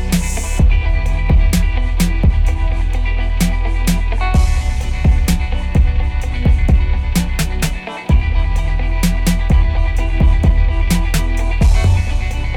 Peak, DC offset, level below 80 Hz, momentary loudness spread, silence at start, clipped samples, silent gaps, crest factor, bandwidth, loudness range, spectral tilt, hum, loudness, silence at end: -4 dBFS; under 0.1%; -14 dBFS; 5 LU; 0 s; under 0.1%; none; 10 dB; 16 kHz; 1 LU; -5.5 dB/octave; none; -17 LUFS; 0 s